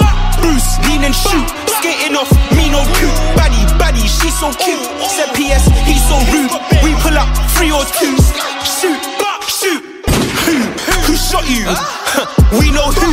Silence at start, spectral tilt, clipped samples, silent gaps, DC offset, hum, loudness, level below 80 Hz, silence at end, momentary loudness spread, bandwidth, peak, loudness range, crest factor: 0 s; -4 dB/octave; under 0.1%; none; under 0.1%; none; -12 LUFS; -14 dBFS; 0 s; 5 LU; 16.5 kHz; 0 dBFS; 2 LU; 12 dB